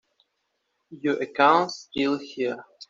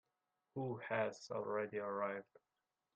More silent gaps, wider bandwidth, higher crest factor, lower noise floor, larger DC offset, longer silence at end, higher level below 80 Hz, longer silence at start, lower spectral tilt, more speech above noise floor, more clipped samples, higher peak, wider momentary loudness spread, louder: neither; second, 7.6 kHz vs 8.8 kHz; about the same, 24 dB vs 20 dB; second, -76 dBFS vs -89 dBFS; neither; second, 0.05 s vs 0.75 s; first, -70 dBFS vs -86 dBFS; first, 0.9 s vs 0.55 s; second, -4.5 dB/octave vs -6 dB/octave; first, 52 dB vs 46 dB; neither; first, -4 dBFS vs -24 dBFS; first, 11 LU vs 7 LU; first, -24 LUFS vs -43 LUFS